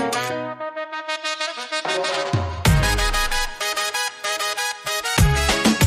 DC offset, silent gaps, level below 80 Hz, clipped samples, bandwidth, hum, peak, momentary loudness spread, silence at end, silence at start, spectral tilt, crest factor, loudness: under 0.1%; none; -30 dBFS; under 0.1%; 15.5 kHz; none; -4 dBFS; 9 LU; 0 s; 0 s; -3.5 dB/octave; 16 dB; -22 LUFS